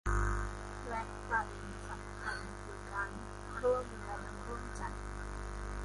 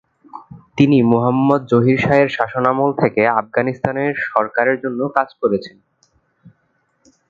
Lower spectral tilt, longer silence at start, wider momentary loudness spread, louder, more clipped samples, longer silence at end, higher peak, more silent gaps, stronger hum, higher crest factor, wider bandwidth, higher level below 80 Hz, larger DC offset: second, -5.5 dB/octave vs -8.5 dB/octave; second, 0.05 s vs 0.35 s; first, 10 LU vs 6 LU; second, -40 LUFS vs -16 LUFS; neither; second, 0 s vs 0.8 s; second, -22 dBFS vs 0 dBFS; neither; first, 50 Hz at -45 dBFS vs none; about the same, 18 dB vs 16 dB; first, 11.5 kHz vs 7.2 kHz; first, -44 dBFS vs -54 dBFS; neither